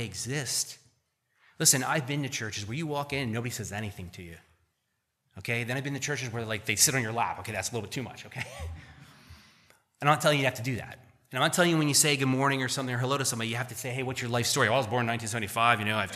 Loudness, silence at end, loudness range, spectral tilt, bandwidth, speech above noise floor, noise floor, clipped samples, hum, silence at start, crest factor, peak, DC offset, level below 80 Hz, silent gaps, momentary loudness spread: -28 LUFS; 0 s; 9 LU; -3 dB/octave; 15 kHz; 50 dB; -79 dBFS; under 0.1%; none; 0 s; 24 dB; -6 dBFS; under 0.1%; -60 dBFS; none; 15 LU